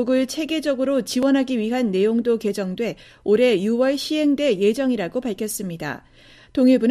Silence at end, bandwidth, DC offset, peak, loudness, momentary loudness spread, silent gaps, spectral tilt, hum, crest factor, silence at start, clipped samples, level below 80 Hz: 0 s; 14.5 kHz; under 0.1%; -6 dBFS; -21 LUFS; 10 LU; none; -5 dB/octave; none; 14 dB; 0 s; under 0.1%; -56 dBFS